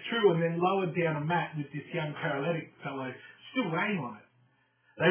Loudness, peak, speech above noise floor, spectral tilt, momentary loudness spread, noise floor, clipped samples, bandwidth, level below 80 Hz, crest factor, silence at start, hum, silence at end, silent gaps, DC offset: -31 LUFS; -12 dBFS; 38 dB; -4.5 dB/octave; 13 LU; -68 dBFS; under 0.1%; 3.5 kHz; -76 dBFS; 20 dB; 0 s; none; 0 s; none; under 0.1%